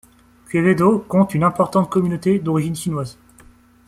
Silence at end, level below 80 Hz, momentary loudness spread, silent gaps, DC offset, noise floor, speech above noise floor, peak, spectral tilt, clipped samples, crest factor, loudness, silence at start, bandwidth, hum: 0.75 s; -52 dBFS; 9 LU; none; under 0.1%; -49 dBFS; 31 dB; -2 dBFS; -7.5 dB/octave; under 0.1%; 16 dB; -18 LUFS; 0.5 s; 14 kHz; none